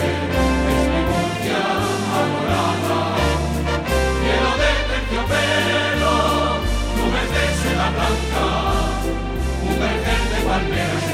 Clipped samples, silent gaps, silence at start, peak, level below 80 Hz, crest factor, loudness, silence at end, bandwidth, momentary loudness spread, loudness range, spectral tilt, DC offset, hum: under 0.1%; none; 0 s; -4 dBFS; -26 dBFS; 14 dB; -19 LUFS; 0 s; 16 kHz; 4 LU; 2 LU; -5 dB/octave; under 0.1%; none